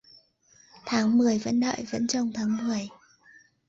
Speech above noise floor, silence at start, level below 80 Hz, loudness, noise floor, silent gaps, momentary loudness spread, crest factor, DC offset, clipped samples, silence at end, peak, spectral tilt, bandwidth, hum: 35 dB; 0.85 s; -66 dBFS; -26 LUFS; -60 dBFS; none; 10 LU; 14 dB; under 0.1%; under 0.1%; 0.8 s; -14 dBFS; -4.5 dB/octave; 7.8 kHz; none